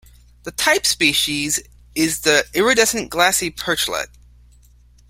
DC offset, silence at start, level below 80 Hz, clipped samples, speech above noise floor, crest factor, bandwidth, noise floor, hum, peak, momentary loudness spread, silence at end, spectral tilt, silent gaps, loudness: under 0.1%; 0.45 s; -46 dBFS; under 0.1%; 31 dB; 20 dB; 16.5 kHz; -50 dBFS; 60 Hz at -45 dBFS; 0 dBFS; 12 LU; 1.05 s; -1.5 dB/octave; none; -17 LUFS